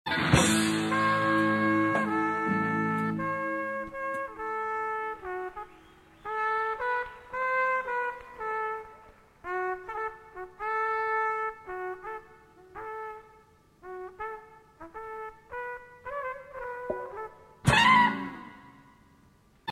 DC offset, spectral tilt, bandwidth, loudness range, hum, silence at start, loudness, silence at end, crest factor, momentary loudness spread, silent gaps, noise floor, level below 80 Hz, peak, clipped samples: under 0.1%; -4.5 dB/octave; 15 kHz; 14 LU; none; 0.05 s; -29 LUFS; 0 s; 24 dB; 19 LU; none; -61 dBFS; -56 dBFS; -6 dBFS; under 0.1%